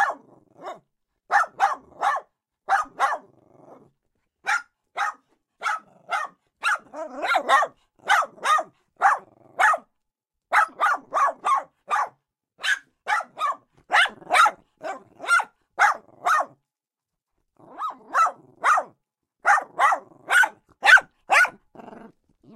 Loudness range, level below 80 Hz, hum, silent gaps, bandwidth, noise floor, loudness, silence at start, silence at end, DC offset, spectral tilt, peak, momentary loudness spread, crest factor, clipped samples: 9 LU; -72 dBFS; none; none; 16 kHz; -87 dBFS; -22 LUFS; 0 s; 0.5 s; under 0.1%; 0.5 dB/octave; -2 dBFS; 17 LU; 22 dB; under 0.1%